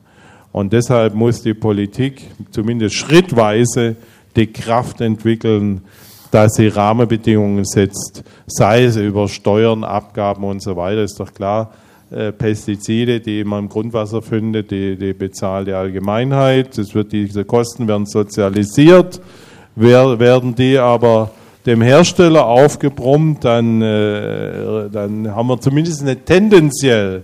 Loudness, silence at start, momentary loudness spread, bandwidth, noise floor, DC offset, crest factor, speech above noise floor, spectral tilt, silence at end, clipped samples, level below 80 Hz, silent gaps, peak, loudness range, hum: -14 LUFS; 0.55 s; 12 LU; 15.5 kHz; -45 dBFS; under 0.1%; 14 dB; 31 dB; -6 dB/octave; 0 s; 0.3%; -46 dBFS; none; 0 dBFS; 8 LU; none